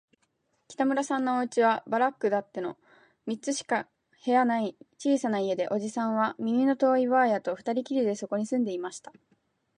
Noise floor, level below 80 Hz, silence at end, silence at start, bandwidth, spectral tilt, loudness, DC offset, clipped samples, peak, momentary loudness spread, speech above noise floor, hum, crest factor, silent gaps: -74 dBFS; -80 dBFS; 0.8 s; 0.7 s; 10.5 kHz; -5 dB/octave; -28 LUFS; under 0.1%; under 0.1%; -12 dBFS; 12 LU; 47 dB; none; 16 dB; none